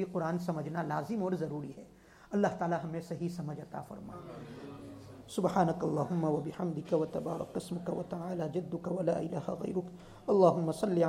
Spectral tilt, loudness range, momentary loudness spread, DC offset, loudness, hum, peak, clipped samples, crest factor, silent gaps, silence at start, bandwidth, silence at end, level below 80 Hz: -7.5 dB/octave; 5 LU; 17 LU; under 0.1%; -34 LUFS; none; -12 dBFS; under 0.1%; 22 dB; none; 0 s; 15 kHz; 0 s; -66 dBFS